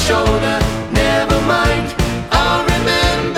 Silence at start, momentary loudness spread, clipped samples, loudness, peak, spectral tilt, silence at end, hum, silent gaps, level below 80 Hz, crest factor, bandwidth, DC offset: 0 s; 4 LU; under 0.1%; -15 LUFS; -2 dBFS; -4.5 dB/octave; 0 s; none; none; -24 dBFS; 14 dB; 16.5 kHz; under 0.1%